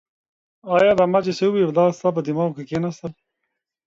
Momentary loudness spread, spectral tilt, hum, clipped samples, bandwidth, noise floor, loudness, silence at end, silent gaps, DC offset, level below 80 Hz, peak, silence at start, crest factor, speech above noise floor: 11 LU; -7 dB/octave; none; under 0.1%; 7.8 kHz; -79 dBFS; -20 LUFS; 0.75 s; none; under 0.1%; -60 dBFS; -4 dBFS; 0.65 s; 16 dB; 60 dB